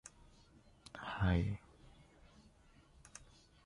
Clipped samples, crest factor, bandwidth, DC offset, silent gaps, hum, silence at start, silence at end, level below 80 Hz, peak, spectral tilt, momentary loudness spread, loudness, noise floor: under 0.1%; 20 dB; 11 kHz; under 0.1%; none; none; 0.05 s; 0.45 s; -52 dBFS; -22 dBFS; -6.5 dB/octave; 28 LU; -39 LUFS; -66 dBFS